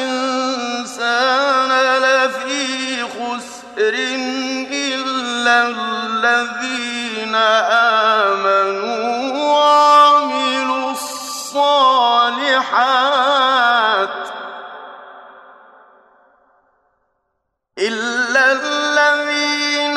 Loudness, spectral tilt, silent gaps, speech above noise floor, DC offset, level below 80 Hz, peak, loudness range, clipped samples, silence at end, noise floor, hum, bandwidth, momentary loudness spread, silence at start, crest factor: -15 LUFS; -1 dB/octave; none; 57 dB; under 0.1%; -70 dBFS; -2 dBFS; 7 LU; under 0.1%; 0 s; -72 dBFS; none; 13.5 kHz; 11 LU; 0 s; 16 dB